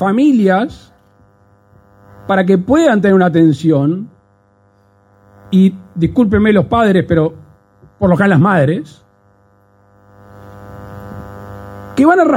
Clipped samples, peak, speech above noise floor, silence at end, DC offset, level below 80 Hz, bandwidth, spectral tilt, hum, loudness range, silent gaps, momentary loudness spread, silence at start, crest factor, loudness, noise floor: under 0.1%; 0 dBFS; 41 dB; 0 s; under 0.1%; -42 dBFS; 9.6 kHz; -8 dB/octave; none; 5 LU; none; 22 LU; 0 s; 14 dB; -12 LUFS; -52 dBFS